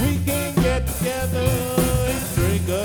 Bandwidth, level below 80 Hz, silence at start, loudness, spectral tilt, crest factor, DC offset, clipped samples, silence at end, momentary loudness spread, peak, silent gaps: over 20 kHz; -30 dBFS; 0 s; -21 LUFS; -5.5 dB/octave; 14 dB; under 0.1%; under 0.1%; 0 s; 3 LU; -6 dBFS; none